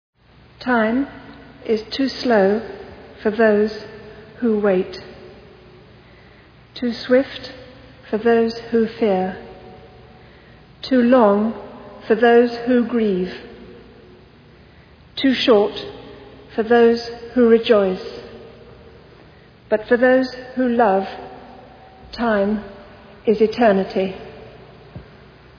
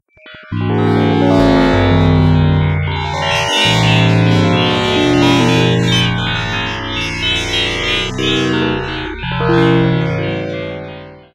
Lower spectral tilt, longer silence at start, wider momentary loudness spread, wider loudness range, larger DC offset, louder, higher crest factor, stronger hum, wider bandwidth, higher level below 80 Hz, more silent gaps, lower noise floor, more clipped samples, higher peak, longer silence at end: first, -7 dB/octave vs -5.5 dB/octave; first, 0.6 s vs 0.25 s; first, 24 LU vs 10 LU; about the same, 5 LU vs 4 LU; neither; second, -18 LUFS vs -13 LUFS; about the same, 18 dB vs 14 dB; neither; second, 5.4 kHz vs 13 kHz; second, -52 dBFS vs -32 dBFS; neither; first, -47 dBFS vs -38 dBFS; neither; about the same, -2 dBFS vs 0 dBFS; first, 0.55 s vs 0.15 s